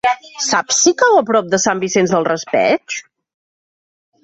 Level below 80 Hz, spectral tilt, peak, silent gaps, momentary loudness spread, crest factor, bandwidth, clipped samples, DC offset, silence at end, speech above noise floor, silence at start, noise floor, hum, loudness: -60 dBFS; -2.5 dB/octave; -2 dBFS; none; 8 LU; 14 dB; 8.2 kHz; under 0.1%; under 0.1%; 1.2 s; over 75 dB; 0.05 s; under -90 dBFS; none; -14 LUFS